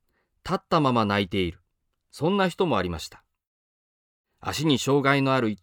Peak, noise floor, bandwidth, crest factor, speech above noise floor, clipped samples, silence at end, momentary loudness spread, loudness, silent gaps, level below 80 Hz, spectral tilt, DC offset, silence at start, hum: -8 dBFS; -75 dBFS; 19.5 kHz; 18 dB; 51 dB; under 0.1%; 0.05 s; 12 LU; -24 LUFS; 3.47-4.24 s; -54 dBFS; -5.5 dB/octave; under 0.1%; 0.45 s; none